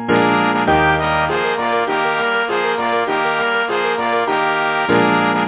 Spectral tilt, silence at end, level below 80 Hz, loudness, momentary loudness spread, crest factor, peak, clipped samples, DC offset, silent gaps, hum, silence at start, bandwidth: -9 dB/octave; 0 s; -42 dBFS; -16 LUFS; 4 LU; 16 dB; -2 dBFS; under 0.1%; under 0.1%; none; none; 0 s; 4 kHz